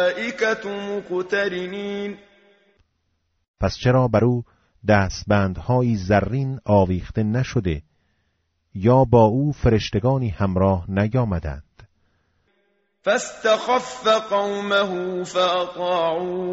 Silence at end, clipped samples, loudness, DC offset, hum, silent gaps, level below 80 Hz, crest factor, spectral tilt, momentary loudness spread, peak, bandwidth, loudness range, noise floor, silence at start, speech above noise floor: 0 s; under 0.1%; -21 LUFS; under 0.1%; none; 3.48-3.54 s; -42 dBFS; 18 dB; -5.5 dB/octave; 10 LU; -4 dBFS; 8 kHz; 5 LU; -71 dBFS; 0 s; 50 dB